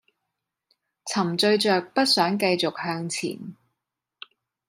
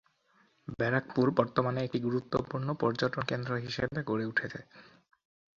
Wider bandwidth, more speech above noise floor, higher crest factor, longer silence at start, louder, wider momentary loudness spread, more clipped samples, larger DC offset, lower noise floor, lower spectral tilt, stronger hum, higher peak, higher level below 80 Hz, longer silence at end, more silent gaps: first, 16 kHz vs 7.4 kHz; first, 60 dB vs 37 dB; about the same, 20 dB vs 24 dB; first, 1.05 s vs 0.7 s; first, -23 LUFS vs -32 LUFS; first, 15 LU vs 7 LU; neither; neither; first, -83 dBFS vs -69 dBFS; second, -4 dB/octave vs -7 dB/octave; neither; about the same, -6 dBFS vs -8 dBFS; second, -74 dBFS vs -62 dBFS; first, 1.15 s vs 0.75 s; neither